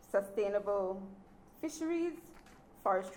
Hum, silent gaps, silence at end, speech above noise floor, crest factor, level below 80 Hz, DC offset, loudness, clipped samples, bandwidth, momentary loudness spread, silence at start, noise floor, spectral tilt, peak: none; none; 0 s; 23 dB; 18 dB; -66 dBFS; under 0.1%; -37 LUFS; under 0.1%; 18.5 kHz; 18 LU; 0 s; -58 dBFS; -5.5 dB/octave; -20 dBFS